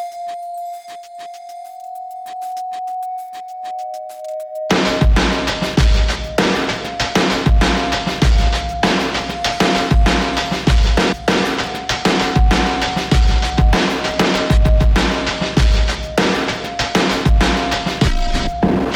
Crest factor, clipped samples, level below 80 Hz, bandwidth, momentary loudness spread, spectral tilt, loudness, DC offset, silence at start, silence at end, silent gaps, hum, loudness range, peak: 14 dB; under 0.1%; -20 dBFS; 14 kHz; 14 LU; -5 dB/octave; -17 LUFS; under 0.1%; 0 s; 0 s; none; none; 12 LU; -2 dBFS